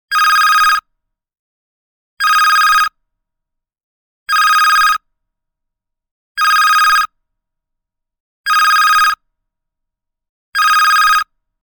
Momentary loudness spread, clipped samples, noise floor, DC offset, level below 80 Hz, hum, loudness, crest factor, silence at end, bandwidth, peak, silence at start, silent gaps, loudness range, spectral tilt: 11 LU; under 0.1%; -78 dBFS; under 0.1%; -50 dBFS; none; -11 LUFS; 14 dB; 0.4 s; 19 kHz; 0 dBFS; 0.1 s; 1.39-2.17 s, 3.83-4.26 s, 6.11-6.35 s, 8.20-8.44 s, 10.29-10.52 s; 3 LU; 4.5 dB/octave